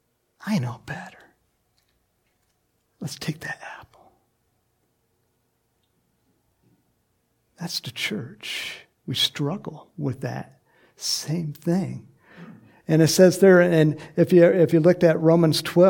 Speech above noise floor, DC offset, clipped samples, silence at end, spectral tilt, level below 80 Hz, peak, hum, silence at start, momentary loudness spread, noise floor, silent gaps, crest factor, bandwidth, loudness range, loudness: 50 dB; under 0.1%; under 0.1%; 0 s; -5.5 dB/octave; -68 dBFS; -4 dBFS; none; 0.45 s; 21 LU; -71 dBFS; none; 20 dB; 17.5 kHz; 20 LU; -21 LUFS